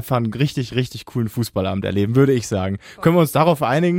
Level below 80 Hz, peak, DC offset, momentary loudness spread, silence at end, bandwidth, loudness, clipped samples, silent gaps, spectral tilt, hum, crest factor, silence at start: -50 dBFS; -4 dBFS; under 0.1%; 8 LU; 0 s; 17 kHz; -19 LUFS; under 0.1%; none; -6.5 dB/octave; none; 16 dB; 0 s